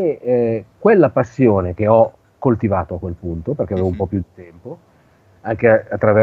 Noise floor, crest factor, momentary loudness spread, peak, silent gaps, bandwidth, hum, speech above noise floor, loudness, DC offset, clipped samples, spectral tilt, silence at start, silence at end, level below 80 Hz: -52 dBFS; 16 dB; 16 LU; 0 dBFS; none; 7.2 kHz; none; 36 dB; -17 LUFS; under 0.1%; under 0.1%; -10 dB/octave; 0 s; 0 s; -44 dBFS